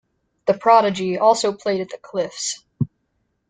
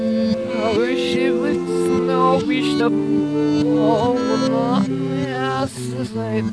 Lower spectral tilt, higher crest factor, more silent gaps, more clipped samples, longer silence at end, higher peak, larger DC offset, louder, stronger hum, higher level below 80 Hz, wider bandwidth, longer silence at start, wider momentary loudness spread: second, -4.5 dB/octave vs -6.5 dB/octave; first, 20 dB vs 14 dB; neither; neither; first, 0.65 s vs 0 s; about the same, -2 dBFS vs -4 dBFS; neither; about the same, -20 LUFS vs -19 LUFS; neither; second, -62 dBFS vs -52 dBFS; second, 9.6 kHz vs 11 kHz; first, 0.45 s vs 0 s; first, 13 LU vs 6 LU